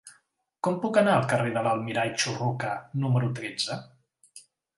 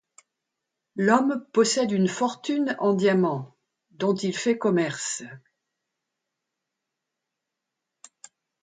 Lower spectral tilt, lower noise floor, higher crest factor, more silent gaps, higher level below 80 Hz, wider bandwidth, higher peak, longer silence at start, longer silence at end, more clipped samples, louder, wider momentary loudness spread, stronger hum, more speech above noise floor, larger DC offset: about the same, -5 dB/octave vs -5 dB/octave; second, -68 dBFS vs -84 dBFS; about the same, 20 dB vs 22 dB; neither; about the same, -70 dBFS vs -74 dBFS; first, 11.5 kHz vs 9.6 kHz; second, -8 dBFS vs -4 dBFS; second, 0.05 s vs 0.95 s; second, 0.4 s vs 3.25 s; neither; second, -27 LUFS vs -24 LUFS; second, 9 LU vs 12 LU; neither; second, 41 dB vs 61 dB; neither